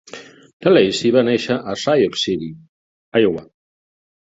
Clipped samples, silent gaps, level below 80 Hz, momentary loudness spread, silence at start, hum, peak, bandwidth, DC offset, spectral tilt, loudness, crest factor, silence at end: under 0.1%; 0.53-0.60 s, 2.69-3.12 s; -56 dBFS; 16 LU; 0.15 s; none; -2 dBFS; 8 kHz; under 0.1%; -5 dB/octave; -17 LUFS; 18 dB; 0.9 s